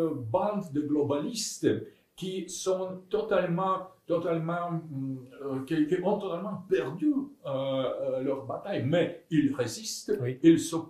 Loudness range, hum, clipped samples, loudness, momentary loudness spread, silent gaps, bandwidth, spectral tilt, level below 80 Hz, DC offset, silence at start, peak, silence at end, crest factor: 2 LU; none; under 0.1%; -30 LUFS; 8 LU; none; 14.5 kHz; -5.5 dB/octave; -66 dBFS; under 0.1%; 0 s; -10 dBFS; 0 s; 20 dB